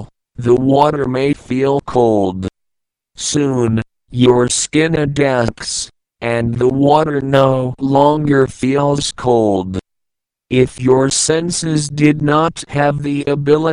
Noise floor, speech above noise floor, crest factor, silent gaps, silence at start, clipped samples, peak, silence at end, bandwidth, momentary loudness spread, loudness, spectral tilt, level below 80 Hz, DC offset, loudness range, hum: -78 dBFS; 64 dB; 14 dB; none; 0 s; under 0.1%; 0 dBFS; 0 s; 11 kHz; 9 LU; -15 LUFS; -5 dB/octave; -42 dBFS; under 0.1%; 2 LU; none